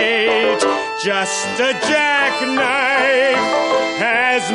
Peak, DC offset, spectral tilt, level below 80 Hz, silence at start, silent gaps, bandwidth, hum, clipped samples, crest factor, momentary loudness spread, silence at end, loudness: -4 dBFS; under 0.1%; -2 dB/octave; -58 dBFS; 0 s; none; 11.5 kHz; none; under 0.1%; 14 dB; 4 LU; 0 s; -15 LUFS